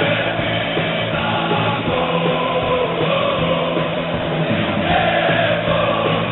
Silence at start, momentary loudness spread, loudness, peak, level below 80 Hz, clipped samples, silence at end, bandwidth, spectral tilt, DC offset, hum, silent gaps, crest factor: 0 s; 3 LU; -18 LUFS; -4 dBFS; -42 dBFS; under 0.1%; 0 s; 4.2 kHz; -10.5 dB/octave; under 0.1%; none; none; 14 dB